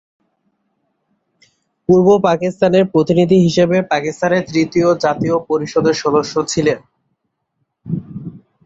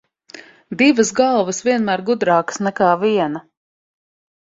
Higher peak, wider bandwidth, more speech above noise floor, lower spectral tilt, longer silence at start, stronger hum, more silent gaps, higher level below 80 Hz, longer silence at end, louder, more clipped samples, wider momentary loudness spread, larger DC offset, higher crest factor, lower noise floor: about the same, -2 dBFS vs -2 dBFS; about the same, 8.2 kHz vs 8 kHz; first, 57 dB vs 26 dB; first, -6 dB/octave vs -4.5 dB/octave; first, 1.9 s vs 0.35 s; neither; neither; first, -52 dBFS vs -62 dBFS; second, 0.3 s vs 1 s; about the same, -15 LUFS vs -17 LUFS; neither; first, 14 LU vs 8 LU; neither; about the same, 14 dB vs 16 dB; first, -70 dBFS vs -42 dBFS